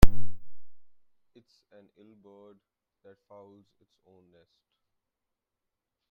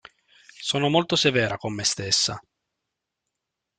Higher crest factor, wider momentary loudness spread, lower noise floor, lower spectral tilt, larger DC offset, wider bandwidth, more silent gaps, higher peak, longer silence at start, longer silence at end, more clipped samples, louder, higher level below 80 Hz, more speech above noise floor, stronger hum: about the same, 24 dB vs 22 dB; first, 15 LU vs 7 LU; about the same, -86 dBFS vs -83 dBFS; first, -6.5 dB/octave vs -3 dB/octave; neither; first, 16 kHz vs 11 kHz; neither; first, 0 dBFS vs -4 dBFS; second, 0 s vs 0.6 s; first, 5.35 s vs 1.4 s; neither; second, -32 LUFS vs -23 LUFS; first, -36 dBFS vs -62 dBFS; second, 29 dB vs 60 dB; neither